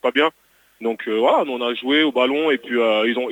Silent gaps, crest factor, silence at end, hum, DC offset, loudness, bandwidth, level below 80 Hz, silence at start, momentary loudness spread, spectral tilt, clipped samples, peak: none; 16 dB; 0 s; none; under 0.1%; -19 LUFS; 18.5 kHz; -72 dBFS; 0.05 s; 7 LU; -4.5 dB/octave; under 0.1%; -4 dBFS